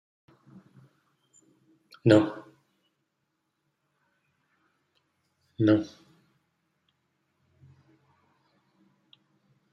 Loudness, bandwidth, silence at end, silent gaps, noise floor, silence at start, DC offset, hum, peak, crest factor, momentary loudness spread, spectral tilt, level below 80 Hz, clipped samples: -24 LUFS; 9 kHz; 3.85 s; none; -79 dBFS; 2.05 s; under 0.1%; none; -6 dBFS; 28 dB; 20 LU; -7.5 dB/octave; -72 dBFS; under 0.1%